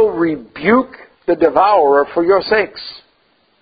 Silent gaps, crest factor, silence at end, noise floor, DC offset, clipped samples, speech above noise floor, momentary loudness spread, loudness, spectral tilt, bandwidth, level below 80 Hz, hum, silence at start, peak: none; 14 dB; 0.65 s; -58 dBFS; under 0.1%; under 0.1%; 44 dB; 15 LU; -14 LUFS; -8.5 dB/octave; 5 kHz; -52 dBFS; none; 0 s; 0 dBFS